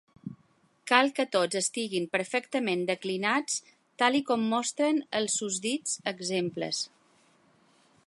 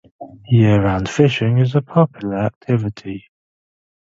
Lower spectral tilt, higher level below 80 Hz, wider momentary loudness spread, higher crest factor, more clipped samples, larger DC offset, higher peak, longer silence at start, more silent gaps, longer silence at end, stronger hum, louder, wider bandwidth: second, -2.5 dB/octave vs -7.5 dB/octave; second, -80 dBFS vs -42 dBFS; second, 8 LU vs 13 LU; first, 26 dB vs 18 dB; neither; neither; second, -4 dBFS vs 0 dBFS; about the same, 0.25 s vs 0.2 s; second, none vs 2.56-2.61 s; first, 1.2 s vs 0.85 s; neither; second, -28 LUFS vs -17 LUFS; first, 11.5 kHz vs 7.8 kHz